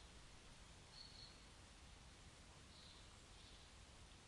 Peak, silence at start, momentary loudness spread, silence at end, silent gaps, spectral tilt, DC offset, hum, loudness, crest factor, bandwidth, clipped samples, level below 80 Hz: -46 dBFS; 0 s; 4 LU; 0 s; none; -3 dB/octave; under 0.1%; none; -62 LUFS; 16 dB; 12 kHz; under 0.1%; -68 dBFS